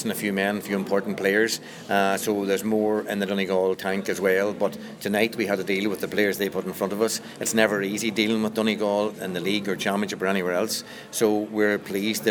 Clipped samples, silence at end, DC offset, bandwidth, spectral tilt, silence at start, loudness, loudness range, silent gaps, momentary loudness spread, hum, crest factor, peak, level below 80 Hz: under 0.1%; 0 s; under 0.1%; over 20 kHz; -4 dB/octave; 0 s; -25 LUFS; 1 LU; none; 5 LU; none; 22 dB; -2 dBFS; -68 dBFS